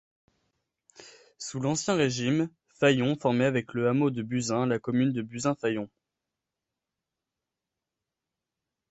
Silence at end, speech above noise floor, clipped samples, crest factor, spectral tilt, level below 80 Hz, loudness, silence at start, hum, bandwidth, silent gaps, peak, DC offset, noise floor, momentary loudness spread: 3.05 s; 61 dB; under 0.1%; 20 dB; -5.5 dB/octave; -68 dBFS; -27 LUFS; 1 s; none; 8.2 kHz; none; -8 dBFS; under 0.1%; -88 dBFS; 8 LU